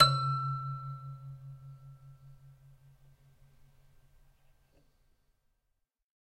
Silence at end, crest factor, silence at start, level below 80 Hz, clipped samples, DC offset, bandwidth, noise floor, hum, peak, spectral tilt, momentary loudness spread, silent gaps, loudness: 3.8 s; 28 dB; 0 s; -64 dBFS; under 0.1%; under 0.1%; 13.5 kHz; -81 dBFS; none; -8 dBFS; -4.5 dB/octave; 25 LU; none; -34 LUFS